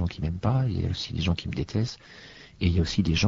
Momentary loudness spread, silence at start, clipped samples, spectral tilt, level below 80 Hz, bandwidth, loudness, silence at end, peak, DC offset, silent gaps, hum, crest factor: 19 LU; 0 s; under 0.1%; -6 dB/octave; -40 dBFS; 7.6 kHz; -28 LUFS; 0 s; -8 dBFS; under 0.1%; none; none; 18 dB